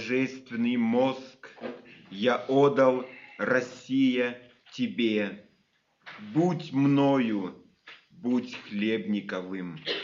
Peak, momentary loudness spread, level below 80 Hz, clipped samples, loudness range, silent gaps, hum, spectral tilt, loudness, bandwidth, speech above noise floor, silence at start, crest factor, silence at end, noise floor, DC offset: -10 dBFS; 19 LU; -76 dBFS; under 0.1%; 3 LU; none; none; -5 dB/octave; -27 LUFS; 7.4 kHz; 43 dB; 0 s; 18 dB; 0 s; -70 dBFS; under 0.1%